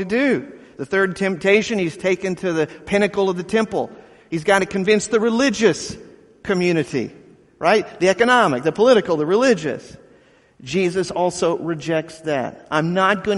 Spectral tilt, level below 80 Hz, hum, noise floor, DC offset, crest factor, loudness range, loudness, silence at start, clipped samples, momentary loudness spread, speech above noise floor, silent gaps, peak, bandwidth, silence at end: -5 dB/octave; -54 dBFS; none; -52 dBFS; under 0.1%; 18 dB; 4 LU; -19 LUFS; 0 s; under 0.1%; 11 LU; 34 dB; none; -2 dBFS; 11.5 kHz; 0 s